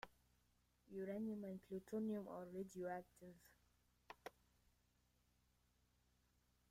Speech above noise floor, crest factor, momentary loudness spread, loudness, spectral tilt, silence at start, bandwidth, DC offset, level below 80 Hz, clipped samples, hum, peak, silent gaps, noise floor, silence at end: 32 dB; 20 dB; 17 LU; -51 LUFS; -7 dB/octave; 0.05 s; 16 kHz; under 0.1%; -82 dBFS; under 0.1%; none; -34 dBFS; none; -81 dBFS; 2.4 s